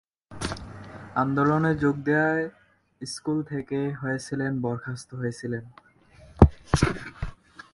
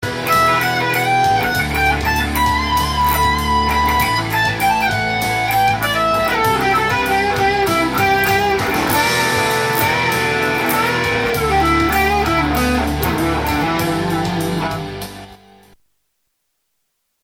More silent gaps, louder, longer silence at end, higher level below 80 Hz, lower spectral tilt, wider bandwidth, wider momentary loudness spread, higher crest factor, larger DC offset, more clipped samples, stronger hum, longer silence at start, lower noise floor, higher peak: neither; second, -26 LUFS vs -16 LUFS; second, 0.4 s vs 1.9 s; about the same, -36 dBFS vs -32 dBFS; first, -6.5 dB/octave vs -4 dB/octave; second, 11.5 kHz vs 17 kHz; first, 17 LU vs 4 LU; first, 26 dB vs 14 dB; neither; neither; neither; first, 0.3 s vs 0 s; second, -53 dBFS vs -70 dBFS; about the same, 0 dBFS vs -2 dBFS